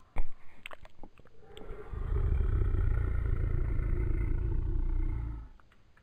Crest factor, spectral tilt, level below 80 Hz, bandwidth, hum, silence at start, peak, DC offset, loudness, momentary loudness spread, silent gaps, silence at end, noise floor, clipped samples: 14 dB; -9 dB/octave; -32 dBFS; 3.8 kHz; none; 0.15 s; -16 dBFS; under 0.1%; -35 LUFS; 18 LU; none; 0.45 s; -57 dBFS; under 0.1%